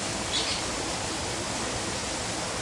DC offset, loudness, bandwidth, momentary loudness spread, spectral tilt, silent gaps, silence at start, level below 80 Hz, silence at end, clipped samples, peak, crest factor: under 0.1%; -29 LUFS; 11.5 kHz; 3 LU; -2 dB/octave; none; 0 s; -48 dBFS; 0 s; under 0.1%; -16 dBFS; 14 dB